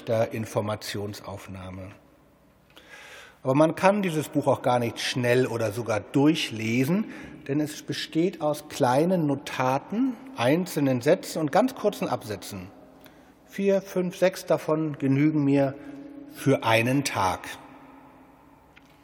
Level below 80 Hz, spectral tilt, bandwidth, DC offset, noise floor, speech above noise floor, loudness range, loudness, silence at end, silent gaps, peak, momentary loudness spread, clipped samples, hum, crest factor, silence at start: -66 dBFS; -6 dB/octave; 19.5 kHz; under 0.1%; -58 dBFS; 33 dB; 3 LU; -25 LUFS; 1.05 s; none; -4 dBFS; 17 LU; under 0.1%; none; 24 dB; 0 s